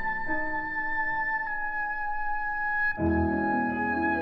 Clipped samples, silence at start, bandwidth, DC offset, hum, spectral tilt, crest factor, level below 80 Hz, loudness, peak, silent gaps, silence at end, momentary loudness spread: under 0.1%; 0 s; 5.6 kHz; under 0.1%; none; -9 dB/octave; 14 dB; -44 dBFS; -28 LUFS; -14 dBFS; none; 0 s; 4 LU